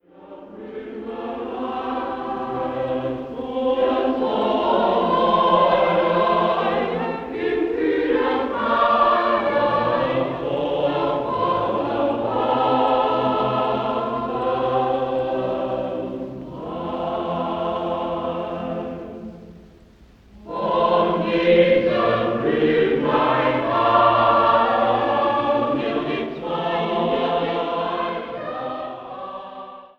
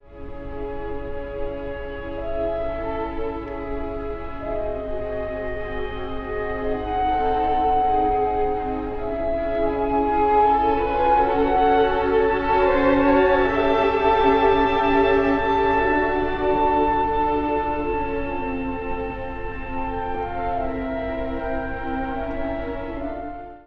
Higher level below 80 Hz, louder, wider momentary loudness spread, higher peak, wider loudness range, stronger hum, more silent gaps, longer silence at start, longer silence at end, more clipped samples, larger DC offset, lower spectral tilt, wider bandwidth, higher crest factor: second, -52 dBFS vs -36 dBFS; about the same, -21 LUFS vs -22 LUFS; about the same, 13 LU vs 13 LU; about the same, -4 dBFS vs -4 dBFS; about the same, 9 LU vs 11 LU; neither; neither; about the same, 0.15 s vs 0.1 s; about the same, 0.1 s vs 0.05 s; neither; neither; about the same, -7.5 dB/octave vs -8 dB/octave; about the same, 6.4 kHz vs 6.4 kHz; about the same, 18 dB vs 16 dB